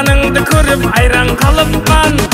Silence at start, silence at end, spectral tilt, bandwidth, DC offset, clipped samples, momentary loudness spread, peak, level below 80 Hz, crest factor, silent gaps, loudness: 0 s; 0 s; -4.5 dB/octave; 16.5 kHz; under 0.1%; under 0.1%; 1 LU; 0 dBFS; -16 dBFS; 10 dB; none; -10 LUFS